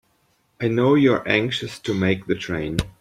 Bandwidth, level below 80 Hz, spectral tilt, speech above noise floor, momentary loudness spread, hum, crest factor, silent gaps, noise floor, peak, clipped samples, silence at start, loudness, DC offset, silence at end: 14 kHz; -44 dBFS; -6 dB/octave; 44 dB; 10 LU; none; 20 dB; none; -65 dBFS; -2 dBFS; under 0.1%; 0.6 s; -21 LUFS; under 0.1%; 0.1 s